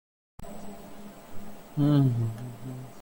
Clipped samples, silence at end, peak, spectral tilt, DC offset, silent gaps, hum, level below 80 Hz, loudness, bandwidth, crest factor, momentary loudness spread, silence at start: under 0.1%; 0 s; -12 dBFS; -8.5 dB/octave; under 0.1%; none; none; -54 dBFS; -27 LUFS; 17 kHz; 18 dB; 23 LU; 0.4 s